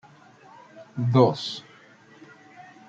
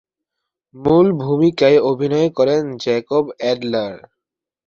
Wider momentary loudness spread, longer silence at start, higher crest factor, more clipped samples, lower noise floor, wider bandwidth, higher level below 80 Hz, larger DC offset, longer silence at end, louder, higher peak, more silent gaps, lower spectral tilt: first, 19 LU vs 8 LU; about the same, 0.75 s vs 0.75 s; first, 22 dB vs 16 dB; neither; second, -52 dBFS vs -84 dBFS; about the same, 7.6 kHz vs 7.2 kHz; second, -70 dBFS vs -54 dBFS; neither; second, 0.25 s vs 0.7 s; second, -23 LUFS vs -17 LUFS; second, -6 dBFS vs -2 dBFS; neither; about the same, -7.5 dB/octave vs -7 dB/octave